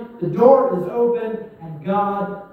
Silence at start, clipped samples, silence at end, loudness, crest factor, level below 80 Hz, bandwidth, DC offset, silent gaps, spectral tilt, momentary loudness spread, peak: 0 s; under 0.1%; 0.05 s; -18 LUFS; 18 dB; -60 dBFS; 5 kHz; under 0.1%; none; -10 dB/octave; 17 LU; 0 dBFS